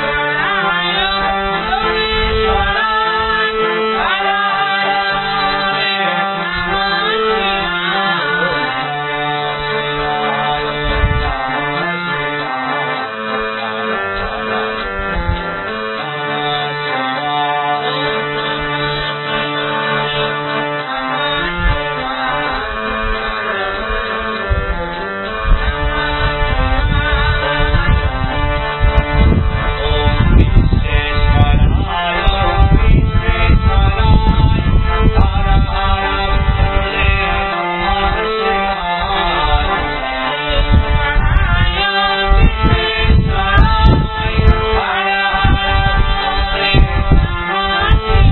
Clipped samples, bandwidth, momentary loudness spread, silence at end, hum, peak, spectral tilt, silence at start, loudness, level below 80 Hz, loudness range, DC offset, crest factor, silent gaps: under 0.1%; 4.3 kHz; 6 LU; 0 s; none; 0 dBFS; -9 dB/octave; 0 s; -15 LUFS; -18 dBFS; 5 LU; under 0.1%; 14 dB; none